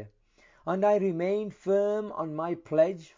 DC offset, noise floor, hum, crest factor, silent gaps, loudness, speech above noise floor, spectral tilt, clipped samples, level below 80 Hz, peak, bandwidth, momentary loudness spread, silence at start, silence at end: under 0.1%; -62 dBFS; none; 16 dB; none; -28 LUFS; 35 dB; -8 dB/octave; under 0.1%; -70 dBFS; -12 dBFS; 7.6 kHz; 9 LU; 0 s; 0.1 s